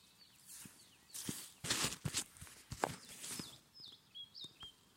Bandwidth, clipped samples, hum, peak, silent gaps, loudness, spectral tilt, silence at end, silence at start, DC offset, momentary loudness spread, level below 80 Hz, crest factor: 16.5 kHz; under 0.1%; none; -18 dBFS; none; -44 LUFS; -2 dB/octave; 0 s; 0 s; under 0.1%; 18 LU; -68 dBFS; 30 dB